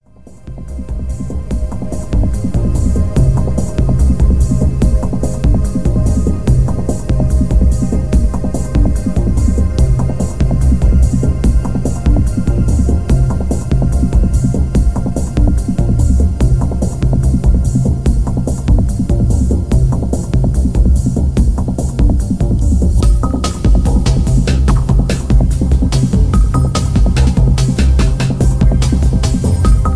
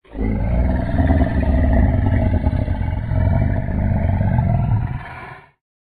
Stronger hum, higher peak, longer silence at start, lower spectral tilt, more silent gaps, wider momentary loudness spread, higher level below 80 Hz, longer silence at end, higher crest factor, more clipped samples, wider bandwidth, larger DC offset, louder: neither; about the same, 0 dBFS vs -2 dBFS; about the same, 0 s vs 0.1 s; second, -7.5 dB/octave vs -11 dB/octave; neither; about the same, 5 LU vs 7 LU; first, -14 dBFS vs -22 dBFS; second, 0 s vs 0.4 s; second, 10 dB vs 16 dB; neither; first, 11 kHz vs 4.5 kHz; first, 4% vs under 0.1%; first, -14 LUFS vs -19 LUFS